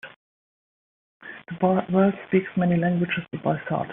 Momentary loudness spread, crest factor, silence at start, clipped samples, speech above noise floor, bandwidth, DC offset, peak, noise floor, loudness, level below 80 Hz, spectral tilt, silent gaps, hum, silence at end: 11 LU; 18 dB; 0.05 s; under 0.1%; over 67 dB; 3.8 kHz; under 0.1%; -6 dBFS; under -90 dBFS; -23 LUFS; -62 dBFS; -6.5 dB/octave; 0.16-1.20 s; none; 0 s